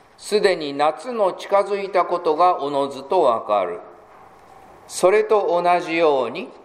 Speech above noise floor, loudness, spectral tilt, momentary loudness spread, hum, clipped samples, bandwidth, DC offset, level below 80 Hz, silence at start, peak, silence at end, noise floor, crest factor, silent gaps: 27 dB; -20 LUFS; -4 dB/octave; 6 LU; none; under 0.1%; 13.5 kHz; under 0.1%; -66 dBFS; 0.2 s; -2 dBFS; 0.1 s; -46 dBFS; 18 dB; none